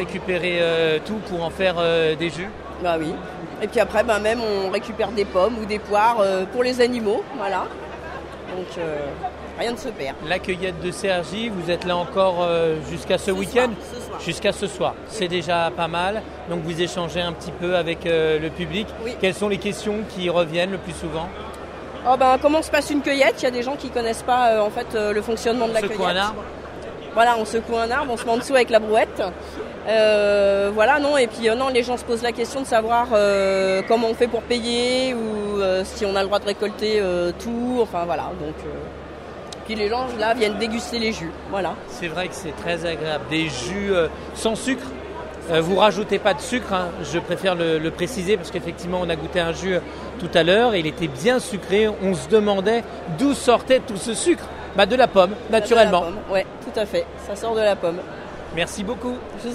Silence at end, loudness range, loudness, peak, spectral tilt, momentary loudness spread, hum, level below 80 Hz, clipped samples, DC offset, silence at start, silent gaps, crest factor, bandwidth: 0 s; 6 LU; -21 LUFS; 0 dBFS; -4.5 dB/octave; 12 LU; none; -44 dBFS; under 0.1%; under 0.1%; 0 s; none; 20 dB; 14.5 kHz